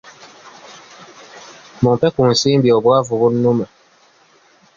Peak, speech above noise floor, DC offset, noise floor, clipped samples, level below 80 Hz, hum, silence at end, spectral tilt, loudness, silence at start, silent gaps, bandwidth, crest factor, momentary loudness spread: -2 dBFS; 38 dB; under 0.1%; -52 dBFS; under 0.1%; -50 dBFS; none; 1.1 s; -6 dB/octave; -15 LUFS; 0.45 s; none; 7.6 kHz; 16 dB; 22 LU